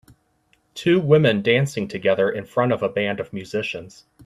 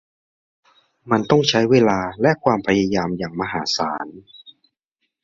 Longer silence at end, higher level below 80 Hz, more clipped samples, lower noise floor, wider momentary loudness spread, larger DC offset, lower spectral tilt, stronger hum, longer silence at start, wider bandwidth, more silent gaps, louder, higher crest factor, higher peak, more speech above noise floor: second, 0.35 s vs 0.75 s; second, -60 dBFS vs -52 dBFS; neither; second, -64 dBFS vs -76 dBFS; about the same, 12 LU vs 10 LU; neither; first, -6.5 dB/octave vs -5 dB/octave; neither; second, 0.75 s vs 1.05 s; first, 13 kHz vs 7.8 kHz; neither; about the same, -21 LUFS vs -19 LUFS; about the same, 20 dB vs 18 dB; about the same, -2 dBFS vs -2 dBFS; second, 44 dB vs 57 dB